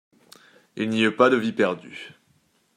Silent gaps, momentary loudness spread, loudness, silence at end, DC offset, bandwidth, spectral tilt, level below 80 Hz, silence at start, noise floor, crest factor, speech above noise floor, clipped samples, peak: none; 22 LU; -22 LUFS; 0.7 s; under 0.1%; 11 kHz; -5.5 dB/octave; -70 dBFS; 0.75 s; -65 dBFS; 22 dB; 43 dB; under 0.1%; -2 dBFS